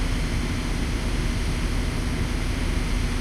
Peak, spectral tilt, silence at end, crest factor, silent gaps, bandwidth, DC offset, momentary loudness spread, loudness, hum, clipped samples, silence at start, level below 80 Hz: -12 dBFS; -5 dB/octave; 0 s; 12 dB; none; 13.5 kHz; under 0.1%; 1 LU; -27 LUFS; none; under 0.1%; 0 s; -26 dBFS